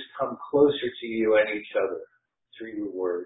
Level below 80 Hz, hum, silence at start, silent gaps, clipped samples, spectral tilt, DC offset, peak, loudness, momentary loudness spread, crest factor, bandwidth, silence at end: -64 dBFS; none; 0 s; none; under 0.1%; -9.5 dB/octave; under 0.1%; -8 dBFS; -26 LUFS; 14 LU; 18 dB; 4 kHz; 0 s